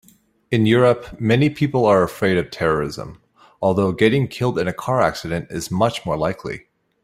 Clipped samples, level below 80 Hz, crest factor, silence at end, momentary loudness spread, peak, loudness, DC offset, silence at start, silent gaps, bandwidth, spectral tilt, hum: under 0.1%; -48 dBFS; 18 dB; 0.45 s; 11 LU; -2 dBFS; -19 LUFS; under 0.1%; 0.5 s; none; 16 kHz; -6.5 dB/octave; none